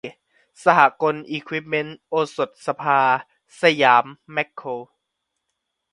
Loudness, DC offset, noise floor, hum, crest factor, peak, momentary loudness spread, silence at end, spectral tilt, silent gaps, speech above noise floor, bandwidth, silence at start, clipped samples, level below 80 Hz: -20 LUFS; under 0.1%; -78 dBFS; none; 22 dB; 0 dBFS; 13 LU; 1.1 s; -5 dB/octave; none; 58 dB; 11.5 kHz; 0.05 s; under 0.1%; -70 dBFS